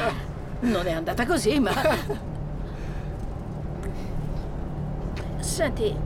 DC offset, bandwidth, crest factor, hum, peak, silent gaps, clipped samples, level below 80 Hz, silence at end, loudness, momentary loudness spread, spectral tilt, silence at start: under 0.1%; 18 kHz; 16 dB; none; -10 dBFS; none; under 0.1%; -34 dBFS; 0 s; -28 LUFS; 12 LU; -5.5 dB/octave; 0 s